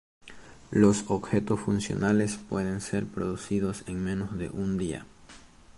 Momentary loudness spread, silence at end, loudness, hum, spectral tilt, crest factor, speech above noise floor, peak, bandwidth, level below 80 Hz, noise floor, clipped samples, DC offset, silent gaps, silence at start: 10 LU; 0.4 s; -29 LUFS; none; -6 dB/octave; 20 dB; 24 dB; -8 dBFS; 11.5 kHz; -50 dBFS; -51 dBFS; under 0.1%; under 0.1%; none; 0.25 s